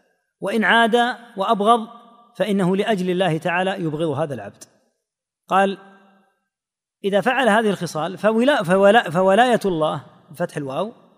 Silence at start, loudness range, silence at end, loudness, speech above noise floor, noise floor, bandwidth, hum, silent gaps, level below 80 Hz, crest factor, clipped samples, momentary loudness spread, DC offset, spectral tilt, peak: 0.4 s; 7 LU; 0.25 s; -19 LUFS; 69 dB; -88 dBFS; 15.5 kHz; none; none; -62 dBFS; 18 dB; under 0.1%; 12 LU; under 0.1%; -5.5 dB/octave; -2 dBFS